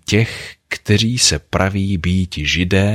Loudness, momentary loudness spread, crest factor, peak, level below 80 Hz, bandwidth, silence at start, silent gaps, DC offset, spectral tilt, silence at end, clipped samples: -16 LUFS; 10 LU; 16 dB; -2 dBFS; -34 dBFS; 14.5 kHz; 0.1 s; none; under 0.1%; -4 dB/octave; 0 s; under 0.1%